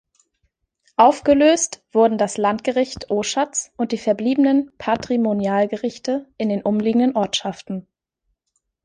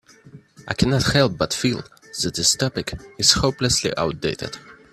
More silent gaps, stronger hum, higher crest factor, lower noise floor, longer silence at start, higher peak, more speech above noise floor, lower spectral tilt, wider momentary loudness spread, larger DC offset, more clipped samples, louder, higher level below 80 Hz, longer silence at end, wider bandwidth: neither; neither; about the same, 18 dB vs 22 dB; first, -74 dBFS vs -46 dBFS; first, 1 s vs 0.25 s; about the same, -2 dBFS vs 0 dBFS; first, 55 dB vs 25 dB; about the same, -4 dB/octave vs -3.5 dB/octave; second, 10 LU vs 14 LU; neither; neither; about the same, -19 LUFS vs -20 LUFS; second, -56 dBFS vs -42 dBFS; first, 1.05 s vs 0.2 s; second, 10 kHz vs 15 kHz